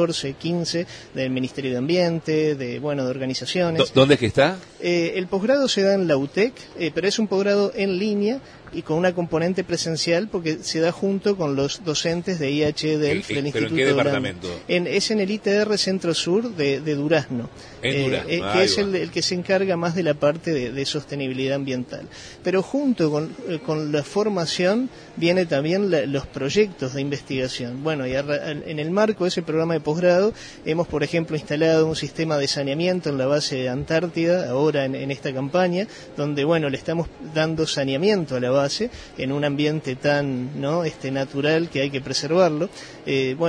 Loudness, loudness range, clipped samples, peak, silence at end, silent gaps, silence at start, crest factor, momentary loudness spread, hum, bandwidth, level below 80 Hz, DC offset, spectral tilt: -22 LUFS; 3 LU; under 0.1%; -4 dBFS; 0 s; none; 0 s; 18 dB; 8 LU; none; 10.5 kHz; -54 dBFS; under 0.1%; -5 dB/octave